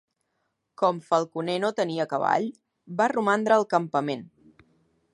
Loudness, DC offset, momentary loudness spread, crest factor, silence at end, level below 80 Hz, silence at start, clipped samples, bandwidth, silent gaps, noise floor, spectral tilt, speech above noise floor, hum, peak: -25 LUFS; under 0.1%; 9 LU; 20 dB; 0.9 s; -76 dBFS; 0.8 s; under 0.1%; 11.5 kHz; none; -77 dBFS; -5.5 dB/octave; 52 dB; none; -6 dBFS